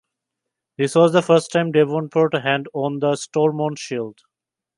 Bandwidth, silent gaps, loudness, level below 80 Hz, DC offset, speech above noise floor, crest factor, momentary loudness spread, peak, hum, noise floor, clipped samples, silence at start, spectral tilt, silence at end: 11.5 kHz; none; -19 LUFS; -70 dBFS; under 0.1%; 67 dB; 18 dB; 11 LU; -2 dBFS; none; -86 dBFS; under 0.1%; 0.8 s; -5.5 dB/octave; 0.65 s